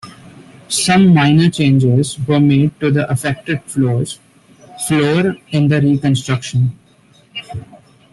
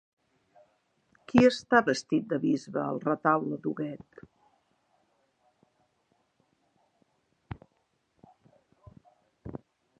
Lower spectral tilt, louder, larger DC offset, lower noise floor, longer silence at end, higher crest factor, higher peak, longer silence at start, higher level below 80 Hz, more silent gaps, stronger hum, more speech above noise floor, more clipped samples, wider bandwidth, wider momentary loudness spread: about the same, -6 dB/octave vs -6 dB/octave; first, -14 LUFS vs -27 LUFS; neither; second, -49 dBFS vs -75 dBFS; about the same, 0.35 s vs 0.45 s; second, 12 dB vs 28 dB; about the same, -2 dBFS vs -4 dBFS; second, 0.05 s vs 1.3 s; first, -48 dBFS vs -64 dBFS; neither; neither; second, 36 dB vs 48 dB; neither; first, 12.5 kHz vs 9.2 kHz; second, 16 LU vs 24 LU